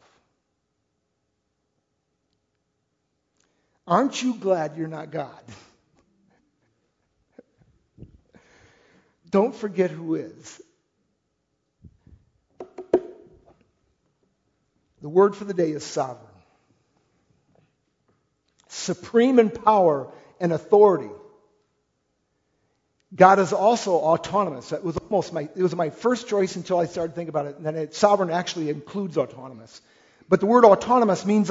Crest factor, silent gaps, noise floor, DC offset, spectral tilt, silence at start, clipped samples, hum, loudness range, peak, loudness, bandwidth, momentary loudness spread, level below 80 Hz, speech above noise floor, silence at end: 24 dB; none; -75 dBFS; under 0.1%; -6 dB/octave; 3.85 s; under 0.1%; none; 13 LU; 0 dBFS; -22 LUFS; 8 kHz; 16 LU; -64 dBFS; 54 dB; 0 s